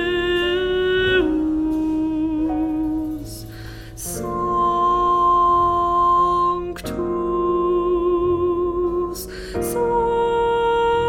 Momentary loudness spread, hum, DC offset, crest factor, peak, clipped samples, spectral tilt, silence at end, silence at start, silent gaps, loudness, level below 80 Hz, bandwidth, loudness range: 12 LU; none; under 0.1%; 12 dB; -6 dBFS; under 0.1%; -5 dB/octave; 0 s; 0 s; none; -20 LUFS; -38 dBFS; 16.5 kHz; 4 LU